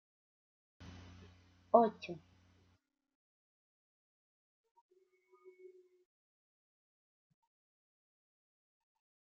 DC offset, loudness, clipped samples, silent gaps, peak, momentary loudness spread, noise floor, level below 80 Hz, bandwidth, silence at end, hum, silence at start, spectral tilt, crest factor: under 0.1%; -32 LUFS; under 0.1%; none; -12 dBFS; 26 LU; -77 dBFS; -80 dBFS; 6.4 kHz; 7.2 s; none; 1.75 s; -5.5 dB/octave; 32 dB